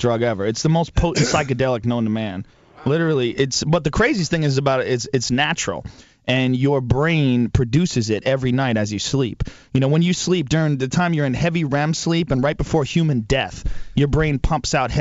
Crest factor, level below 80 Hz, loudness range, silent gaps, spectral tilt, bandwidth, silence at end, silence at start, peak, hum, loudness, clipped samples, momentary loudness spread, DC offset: 18 dB; -34 dBFS; 1 LU; none; -5.5 dB/octave; 8 kHz; 0 s; 0 s; -2 dBFS; none; -20 LUFS; under 0.1%; 5 LU; under 0.1%